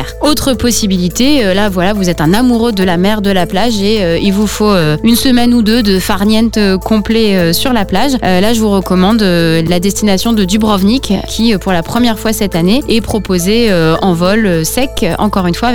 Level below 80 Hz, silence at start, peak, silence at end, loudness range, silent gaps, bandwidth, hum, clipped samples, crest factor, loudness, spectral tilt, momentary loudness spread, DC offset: -26 dBFS; 0 s; 0 dBFS; 0 s; 1 LU; none; 20 kHz; none; under 0.1%; 10 dB; -11 LUFS; -5 dB/octave; 3 LU; 6%